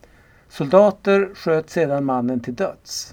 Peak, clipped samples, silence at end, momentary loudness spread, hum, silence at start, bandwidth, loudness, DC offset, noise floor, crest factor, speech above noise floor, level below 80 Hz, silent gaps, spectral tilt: 0 dBFS; under 0.1%; 0.05 s; 11 LU; none; 0.55 s; 17 kHz; -20 LUFS; under 0.1%; -51 dBFS; 20 dB; 32 dB; -56 dBFS; none; -5.5 dB/octave